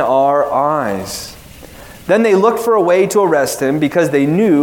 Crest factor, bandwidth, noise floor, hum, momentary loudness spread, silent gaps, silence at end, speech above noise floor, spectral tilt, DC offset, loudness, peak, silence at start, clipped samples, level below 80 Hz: 14 dB; 18 kHz; -36 dBFS; none; 11 LU; none; 0 s; 23 dB; -5.5 dB/octave; under 0.1%; -13 LUFS; 0 dBFS; 0 s; under 0.1%; -48 dBFS